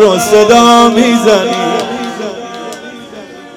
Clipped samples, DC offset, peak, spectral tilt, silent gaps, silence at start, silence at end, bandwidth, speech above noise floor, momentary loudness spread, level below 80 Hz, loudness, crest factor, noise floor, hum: 3%; under 0.1%; 0 dBFS; -3.5 dB/octave; none; 0 s; 0.05 s; 19.5 kHz; 23 dB; 23 LU; -46 dBFS; -8 LUFS; 10 dB; -30 dBFS; none